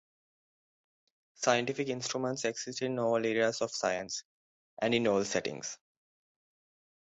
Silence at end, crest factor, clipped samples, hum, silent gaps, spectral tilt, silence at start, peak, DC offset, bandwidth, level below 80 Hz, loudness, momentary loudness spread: 1.3 s; 22 dB; under 0.1%; none; 4.25-4.77 s; -3.5 dB/octave; 1.4 s; -12 dBFS; under 0.1%; 8.4 kHz; -72 dBFS; -32 LUFS; 10 LU